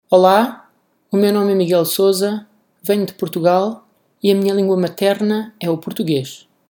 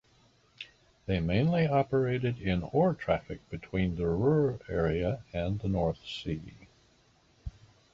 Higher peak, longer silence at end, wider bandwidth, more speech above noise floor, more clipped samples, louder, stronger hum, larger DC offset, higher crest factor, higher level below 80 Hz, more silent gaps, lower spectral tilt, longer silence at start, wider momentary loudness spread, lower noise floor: first, 0 dBFS vs -14 dBFS; second, 0.3 s vs 0.45 s; first, 19.5 kHz vs 7.4 kHz; first, 41 dB vs 36 dB; neither; first, -17 LUFS vs -30 LUFS; neither; neither; about the same, 16 dB vs 18 dB; second, -72 dBFS vs -48 dBFS; neither; second, -5.5 dB/octave vs -8.5 dB/octave; second, 0.1 s vs 0.6 s; second, 8 LU vs 20 LU; second, -57 dBFS vs -65 dBFS